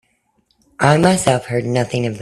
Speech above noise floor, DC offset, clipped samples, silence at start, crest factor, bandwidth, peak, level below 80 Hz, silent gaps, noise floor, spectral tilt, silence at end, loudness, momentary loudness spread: 47 dB; under 0.1%; under 0.1%; 0.8 s; 18 dB; 13.5 kHz; 0 dBFS; -50 dBFS; none; -63 dBFS; -5.5 dB/octave; 0 s; -16 LUFS; 7 LU